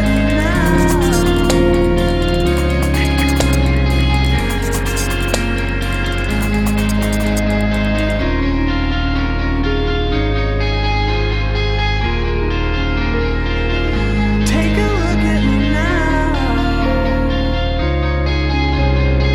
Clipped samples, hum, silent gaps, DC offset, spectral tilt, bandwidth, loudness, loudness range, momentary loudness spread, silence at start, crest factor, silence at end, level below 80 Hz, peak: under 0.1%; none; none; under 0.1%; -6 dB/octave; 17.5 kHz; -16 LUFS; 3 LU; 4 LU; 0 s; 14 dB; 0 s; -18 dBFS; -2 dBFS